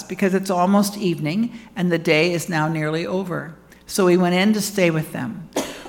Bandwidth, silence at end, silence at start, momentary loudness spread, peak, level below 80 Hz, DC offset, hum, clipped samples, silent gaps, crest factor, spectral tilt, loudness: 18 kHz; 0 s; 0 s; 10 LU; -2 dBFS; -56 dBFS; under 0.1%; none; under 0.1%; none; 18 dB; -5.5 dB/octave; -20 LUFS